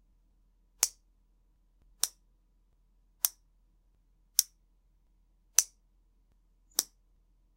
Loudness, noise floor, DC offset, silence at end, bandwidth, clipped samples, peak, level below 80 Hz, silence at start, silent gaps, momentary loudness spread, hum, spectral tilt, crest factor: -31 LUFS; -68 dBFS; under 0.1%; 0.75 s; 16 kHz; under 0.1%; -2 dBFS; -68 dBFS; 0.8 s; none; 9 LU; none; 3 dB/octave; 36 dB